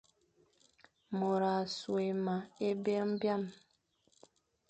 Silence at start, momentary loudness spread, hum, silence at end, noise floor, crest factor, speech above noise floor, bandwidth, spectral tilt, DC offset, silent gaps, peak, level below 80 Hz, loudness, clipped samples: 1.1 s; 5 LU; none; 1.15 s; -75 dBFS; 16 dB; 40 dB; 8.8 kHz; -6.5 dB/octave; under 0.1%; none; -22 dBFS; -80 dBFS; -35 LUFS; under 0.1%